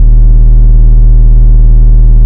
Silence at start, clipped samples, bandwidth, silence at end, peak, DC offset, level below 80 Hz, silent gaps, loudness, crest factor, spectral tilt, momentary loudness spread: 0 s; 20%; 1 kHz; 0 s; 0 dBFS; under 0.1%; -2 dBFS; none; -7 LUFS; 2 dB; -12.5 dB/octave; 0 LU